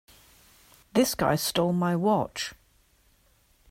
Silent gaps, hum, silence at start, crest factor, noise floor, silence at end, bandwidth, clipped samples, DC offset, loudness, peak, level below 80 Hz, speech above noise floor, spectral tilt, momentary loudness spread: none; none; 0.95 s; 18 dB; -64 dBFS; 1.15 s; 16 kHz; under 0.1%; under 0.1%; -26 LUFS; -10 dBFS; -58 dBFS; 39 dB; -5 dB/octave; 9 LU